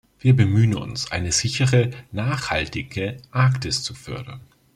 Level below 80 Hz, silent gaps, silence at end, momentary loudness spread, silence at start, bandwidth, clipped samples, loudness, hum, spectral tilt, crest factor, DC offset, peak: -46 dBFS; none; 0.35 s; 12 LU; 0.25 s; 11.5 kHz; under 0.1%; -21 LUFS; none; -5 dB/octave; 18 dB; under 0.1%; -4 dBFS